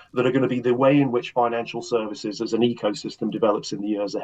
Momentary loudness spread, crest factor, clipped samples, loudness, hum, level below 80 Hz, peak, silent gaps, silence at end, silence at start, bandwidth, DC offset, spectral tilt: 10 LU; 16 dB; under 0.1%; -23 LUFS; none; -70 dBFS; -6 dBFS; none; 0 s; 0.15 s; 8.6 kHz; under 0.1%; -6 dB/octave